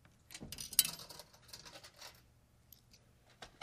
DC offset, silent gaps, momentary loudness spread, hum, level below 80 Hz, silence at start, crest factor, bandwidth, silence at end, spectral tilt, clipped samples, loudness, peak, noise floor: under 0.1%; none; 23 LU; none; -68 dBFS; 0.3 s; 34 dB; 15.5 kHz; 0.15 s; 0 dB/octave; under 0.1%; -35 LUFS; -10 dBFS; -68 dBFS